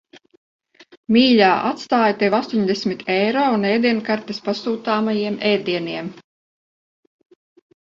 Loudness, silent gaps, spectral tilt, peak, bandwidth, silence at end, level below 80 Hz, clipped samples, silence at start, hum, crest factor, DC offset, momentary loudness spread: -19 LUFS; 0.37-0.59 s, 0.97-1.03 s; -6 dB/octave; 0 dBFS; 7.4 kHz; 1.75 s; -62 dBFS; under 0.1%; 0.15 s; none; 20 dB; under 0.1%; 10 LU